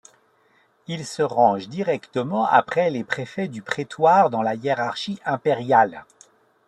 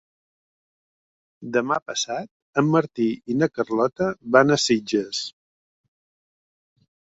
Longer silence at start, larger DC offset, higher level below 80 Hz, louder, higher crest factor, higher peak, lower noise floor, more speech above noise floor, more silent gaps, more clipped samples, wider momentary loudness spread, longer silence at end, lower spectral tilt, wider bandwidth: second, 0.9 s vs 1.4 s; neither; about the same, -68 dBFS vs -64 dBFS; about the same, -22 LUFS vs -22 LUFS; about the same, 20 dB vs 22 dB; about the same, -4 dBFS vs -2 dBFS; second, -61 dBFS vs under -90 dBFS; second, 40 dB vs over 68 dB; second, none vs 1.82-1.86 s, 2.31-2.53 s; neither; about the same, 11 LU vs 11 LU; second, 0.65 s vs 1.7 s; about the same, -5.5 dB/octave vs -4.5 dB/octave; first, 11.5 kHz vs 8 kHz